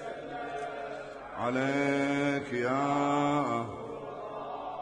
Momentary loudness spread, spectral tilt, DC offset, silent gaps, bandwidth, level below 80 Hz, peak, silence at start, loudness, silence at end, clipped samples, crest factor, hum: 12 LU; -6 dB/octave; under 0.1%; none; 10 kHz; -64 dBFS; -16 dBFS; 0 s; -32 LUFS; 0 s; under 0.1%; 14 dB; none